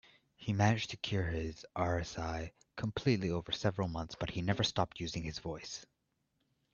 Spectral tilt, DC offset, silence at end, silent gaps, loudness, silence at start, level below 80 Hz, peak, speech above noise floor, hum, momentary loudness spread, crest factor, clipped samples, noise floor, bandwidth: -5.5 dB/octave; under 0.1%; 0.9 s; none; -36 LUFS; 0.4 s; -56 dBFS; -14 dBFS; 45 dB; none; 11 LU; 22 dB; under 0.1%; -81 dBFS; 7.4 kHz